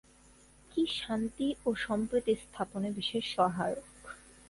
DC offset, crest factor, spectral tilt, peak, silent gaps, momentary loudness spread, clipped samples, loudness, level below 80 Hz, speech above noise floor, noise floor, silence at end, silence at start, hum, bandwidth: under 0.1%; 20 dB; -5 dB/octave; -14 dBFS; none; 10 LU; under 0.1%; -33 LUFS; -60 dBFS; 28 dB; -60 dBFS; 0.3 s; 0.7 s; none; 11.5 kHz